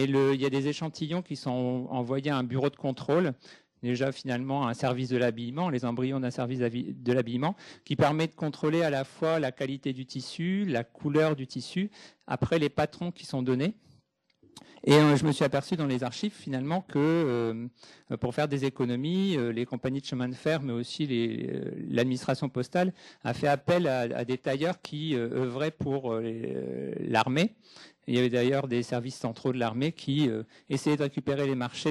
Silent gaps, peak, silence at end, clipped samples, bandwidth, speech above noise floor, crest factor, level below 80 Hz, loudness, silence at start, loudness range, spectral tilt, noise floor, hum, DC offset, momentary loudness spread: none; -6 dBFS; 0 s; under 0.1%; 13 kHz; 38 dB; 22 dB; -64 dBFS; -29 LUFS; 0 s; 3 LU; -6.5 dB/octave; -67 dBFS; none; under 0.1%; 9 LU